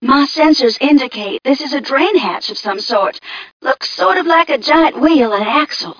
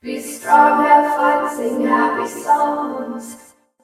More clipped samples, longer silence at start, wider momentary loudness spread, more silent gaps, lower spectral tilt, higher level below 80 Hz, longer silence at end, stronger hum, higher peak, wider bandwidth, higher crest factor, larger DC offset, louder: neither; about the same, 0 s vs 0.05 s; second, 9 LU vs 15 LU; first, 3.52-3.60 s vs none; about the same, -3.5 dB/octave vs -3.5 dB/octave; first, -52 dBFS vs -66 dBFS; second, 0.05 s vs 0.5 s; neither; about the same, 0 dBFS vs 0 dBFS; second, 5.4 kHz vs 15.5 kHz; about the same, 12 dB vs 16 dB; neither; first, -13 LUFS vs -16 LUFS